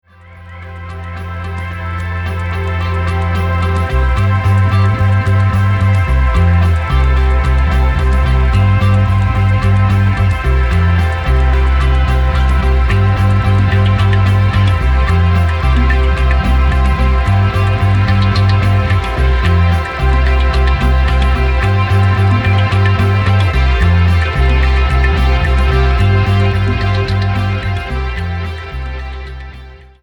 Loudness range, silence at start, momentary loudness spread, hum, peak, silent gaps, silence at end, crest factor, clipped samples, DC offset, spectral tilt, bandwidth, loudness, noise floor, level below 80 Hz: 3 LU; 0.3 s; 8 LU; none; 0 dBFS; none; 0.25 s; 10 dB; under 0.1%; under 0.1%; -7.5 dB/octave; 11.5 kHz; -13 LUFS; -35 dBFS; -16 dBFS